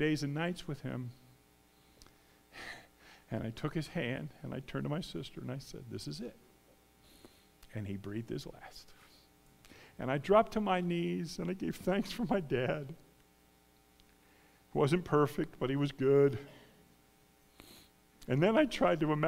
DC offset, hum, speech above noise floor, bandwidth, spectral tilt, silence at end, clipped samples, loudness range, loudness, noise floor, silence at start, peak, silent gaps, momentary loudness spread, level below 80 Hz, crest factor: under 0.1%; none; 33 dB; 16 kHz; -6.5 dB/octave; 0 s; under 0.1%; 12 LU; -34 LUFS; -66 dBFS; 0 s; -12 dBFS; none; 20 LU; -60 dBFS; 24 dB